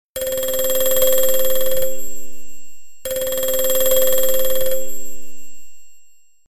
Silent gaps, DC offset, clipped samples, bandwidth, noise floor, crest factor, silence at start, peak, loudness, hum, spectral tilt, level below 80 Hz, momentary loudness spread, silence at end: none; 10%; under 0.1%; 17.5 kHz; -47 dBFS; 14 dB; 0.05 s; -4 dBFS; -19 LUFS; none; -1.5 dB/octave; -42 dBFS; 18 LU; 0 s